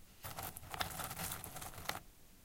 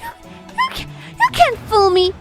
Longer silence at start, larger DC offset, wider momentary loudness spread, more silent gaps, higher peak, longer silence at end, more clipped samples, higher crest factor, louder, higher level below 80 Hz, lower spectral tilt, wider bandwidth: about the same, 0 s vs 0 s; neither; second, 8 LU vs 17 LU; neither; second, -16 dBFS vs 0 dBFS; about the same, 0 s vs 0 s; neither; first, 30 dB vs 16 dB; second, -44 LUFS vs -15 LUFS; second, -60 dBFS vs -40 dBFS; second, -2.5 dB/octave vs -4 dB/octave; about the same, 17 kHz vs 15.5 kHz